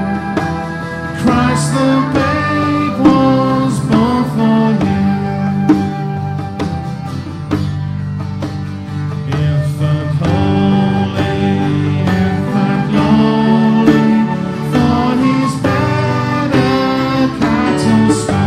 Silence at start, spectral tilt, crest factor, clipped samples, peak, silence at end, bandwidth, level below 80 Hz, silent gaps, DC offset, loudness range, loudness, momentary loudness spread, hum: 0 s; -7 dB/octave; 14 dB; under 0.1%; 0 dBFS; 0 s; 13 kHz; -38 dBFS; none; under 0.1%; 6 LU; -14 LUFS; 10 LU; none